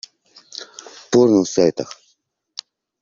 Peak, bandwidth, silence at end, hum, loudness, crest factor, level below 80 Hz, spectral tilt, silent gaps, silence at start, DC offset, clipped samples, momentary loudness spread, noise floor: -2 dBFS; 7.6 kHz; 1.1 s; none; -17 LUFS; 18 dB; -60 dBFS; -5.5 dB/octave; none; 0.6 s; under 0.1%; under 0.1%; 22 LU; -65 dBFS